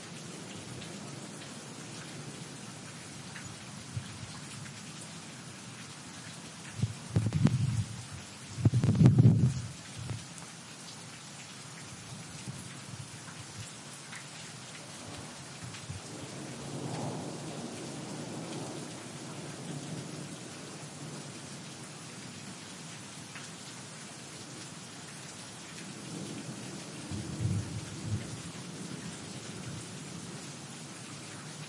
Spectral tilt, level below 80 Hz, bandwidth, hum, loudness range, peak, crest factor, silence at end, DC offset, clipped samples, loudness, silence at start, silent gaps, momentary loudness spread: -5.5 dB/octave; -62 dBFS; 11.5 kHz; none; 14 LU; -8 dBFS; 28 dB; 0 s; under 0.1%; under 0.1%; -37 LUFS; 0 s; none; 12 LU